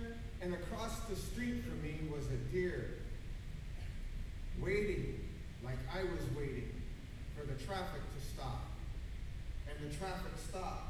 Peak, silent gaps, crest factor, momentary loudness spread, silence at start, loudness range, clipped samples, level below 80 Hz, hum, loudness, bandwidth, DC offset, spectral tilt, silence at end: -24 dBFS; none; 18 dB; 10 LU; 0 s; 3 LU; under 0.1%; -46 dBFS; none; -44 LUFS; 15 kHz; under 0.1%; -6 dB/octave; 0 s